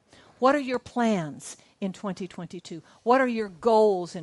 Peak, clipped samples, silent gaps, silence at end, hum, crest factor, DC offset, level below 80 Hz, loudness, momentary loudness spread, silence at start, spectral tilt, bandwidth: -8 dBFS; under 0.1%; none; 0 s; none; 18 dB; under 0.1%; -68 dBFS; -25 LUFS; 18 LU; 0.4 s; -5.5 dB/octave; 11.5 kHz